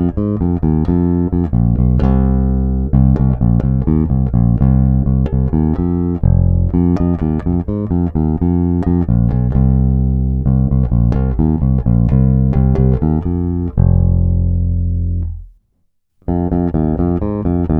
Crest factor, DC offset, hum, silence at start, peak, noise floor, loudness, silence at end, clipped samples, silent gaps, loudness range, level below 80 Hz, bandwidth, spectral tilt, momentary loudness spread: 14 dB; under 0.1%; none; 0 s; 0 dBFS; -62 dBFS; -15 LUFS; 0 s; under 0.1%; none; 3 LU; -20 dBFS; 2.9 kHz; -13 dB/octave; 5 LU